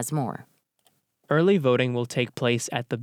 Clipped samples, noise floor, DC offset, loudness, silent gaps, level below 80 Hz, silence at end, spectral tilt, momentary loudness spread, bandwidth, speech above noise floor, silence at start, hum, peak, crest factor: under 0.1%; -68 dBFS; under 0.1%; -24 LUFS; none; -72 dBFS; 0 s; -5.5 dB/octave; 9 LU; 16.5 kHz; 44 dB; 0 s; none; -8 dBFS; 18 dB